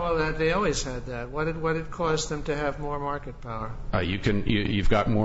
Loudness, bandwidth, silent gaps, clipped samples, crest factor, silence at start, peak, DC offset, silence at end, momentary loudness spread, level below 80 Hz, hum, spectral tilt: -28 LUFS; 8 kHz; none; under 0.1%; 16 dB; 0 s; -10 dBFS; under 0.1%; 0 s; 10 LU; -34 dBFS; none; -5.5 dB/octave